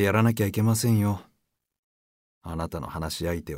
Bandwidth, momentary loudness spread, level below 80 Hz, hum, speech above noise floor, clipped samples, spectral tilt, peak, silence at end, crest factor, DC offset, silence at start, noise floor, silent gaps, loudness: 16 kHz; 13 LU; -48 dBFS; none; 49 dB; under 0.1%; -6 dB/octave; -8 dBFS; 0 s; 18 dB; under 0.1%; 0 s; -74 dBFS; 1.78-2.41 s; -26 LUFS